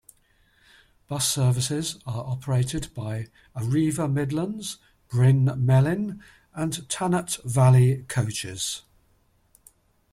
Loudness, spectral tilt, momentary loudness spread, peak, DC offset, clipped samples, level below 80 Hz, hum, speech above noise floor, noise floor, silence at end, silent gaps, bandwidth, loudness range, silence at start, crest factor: -24 LUFS; -5.5 dB/octave; 14 LU; -6 dBFS; under 0.1%; under 0.1%; -52 dBFS; none; 40 dB; -64 dBFS; 1.3 s; none; 13.5 kHz; 5 LU; 1.1 s; 18 dB